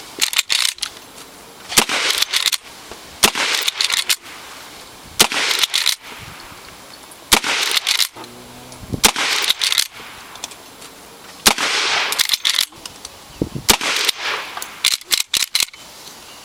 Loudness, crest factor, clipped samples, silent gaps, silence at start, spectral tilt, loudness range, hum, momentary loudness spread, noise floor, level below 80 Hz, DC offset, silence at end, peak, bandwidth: -16 LUFS; 20 dB; under 0.1%; none; 0 s; 0 dB/octave; 2 LU; none; 22 LU; -39 dBFS; -46 dBFS; under 0.1%; 0 s; 0 dBFS; 17 kHz